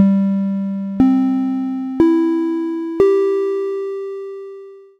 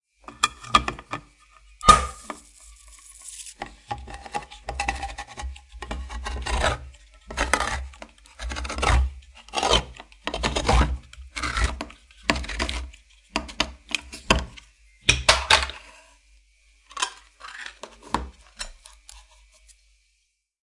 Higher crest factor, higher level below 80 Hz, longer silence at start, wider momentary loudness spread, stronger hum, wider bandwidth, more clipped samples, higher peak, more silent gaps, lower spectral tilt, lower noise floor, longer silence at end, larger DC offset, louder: second, 16 dB vs 28 dB; second, -50 dBFS vs -34 dBFS; second, 0 s vs 0.3 s; second, 14 LU vs 22 LU; neither; second, 7 kHz vs 11.5 kHz; neither; about the same, 0 dBFS vs 0 dBFS; neither; first, -9.5 dB/octave vs -3 dB/octave; second, -37 dBFS vs -72 dBFS; second, 0.15 s vs 1.45 s; neither; first, -17 LUFS vs -25 LUFS